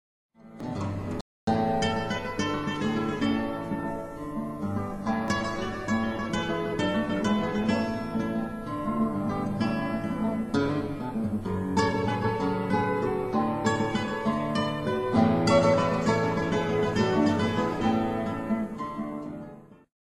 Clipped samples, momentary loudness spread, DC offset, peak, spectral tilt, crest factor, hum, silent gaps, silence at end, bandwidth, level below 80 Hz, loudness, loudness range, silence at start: under 0.1%; 9 LU; under 0.1%; -8 dBFS; -6.5 dB/octave; 18 dB; none; 1.21-1.47 s; 0.25 s; 12.5 kHz; -50 dBFS; -28 LUFS; 5 LU; 0.45 s